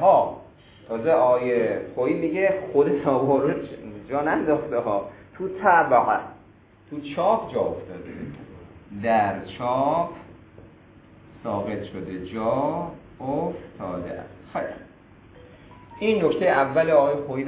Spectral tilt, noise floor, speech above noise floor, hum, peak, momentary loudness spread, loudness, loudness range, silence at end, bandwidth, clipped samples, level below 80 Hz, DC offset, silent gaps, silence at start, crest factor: -10.5 dB/octave; -52 dBFS; 30 dB; none; -4 dBFS; 18 LU; -23 LUFS; 7 LU; 0 s; 4 kHz; under 0.1%; -54 dBFS; under 0.1%; none; 0 s; 20 dB